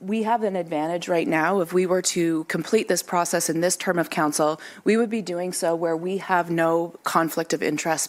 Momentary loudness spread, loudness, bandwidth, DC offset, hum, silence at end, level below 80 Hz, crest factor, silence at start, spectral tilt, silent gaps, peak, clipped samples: 4 LU; -23 LUFS; 16 kHz; under 0.1%; none; 0 s; -72 dBFS; 18 dB; 0 s; -4 dB/octave; none; -6 dBFS; under 0.1%